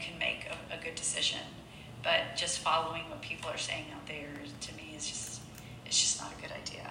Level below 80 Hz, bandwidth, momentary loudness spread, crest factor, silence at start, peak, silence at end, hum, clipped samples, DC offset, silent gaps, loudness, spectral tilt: -60 dBFS; 16 kHz; 14 LU; 22 dB; 0 s; -14 dBFS; 0 s; none; under 0.1%; under 0.1%; none; -34 LUFS; -1 dB/octave